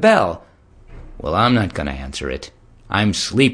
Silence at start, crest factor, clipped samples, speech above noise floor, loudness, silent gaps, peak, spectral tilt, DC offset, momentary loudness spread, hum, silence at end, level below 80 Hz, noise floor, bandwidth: 0 s; 20 dB; under 0.1%; 26 dB; -19 LUFS; none; 0 dBFS; -5 dB/octave; under 0.1%; 15 LU; none; 0 s; -38 dBFS; -44 dBFS; 10.5 kHz